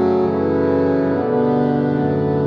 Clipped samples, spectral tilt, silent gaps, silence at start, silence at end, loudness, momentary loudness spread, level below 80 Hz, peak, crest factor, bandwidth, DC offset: under 0.1%; -10.5 dB/octave; none; 0 s; 0 s; -17 LUFS; 1 LU; -52 dBFS; -4 dBFS; 12 dB; 5.8 kHz; under 0.1%